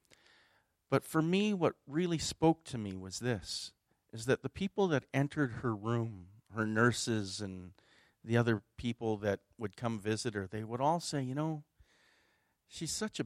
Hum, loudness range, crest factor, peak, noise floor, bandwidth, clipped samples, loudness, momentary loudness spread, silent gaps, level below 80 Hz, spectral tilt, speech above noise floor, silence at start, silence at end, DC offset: none; 3 LU; 22 dB; -14 dBFS; -75 dBFS; 15.5 kHz; under 0.1%; -35 LUFS; 12 LU; none; -66 dBFS; -5.5 dB/octave; 40 dB; 0.9 s; 0 s; under 0.1%